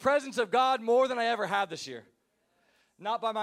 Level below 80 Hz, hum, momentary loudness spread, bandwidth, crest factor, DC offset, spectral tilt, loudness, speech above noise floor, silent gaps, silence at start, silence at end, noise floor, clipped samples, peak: -78 dBFS; none; 14 LU; 14 kHz; 16 dB; under 0.1%; -3.5 dB/octave; -28 LUFS; 45 dB; none; 0 s; 0 s; -73 dBFS; under 0.1%; -14 dBFS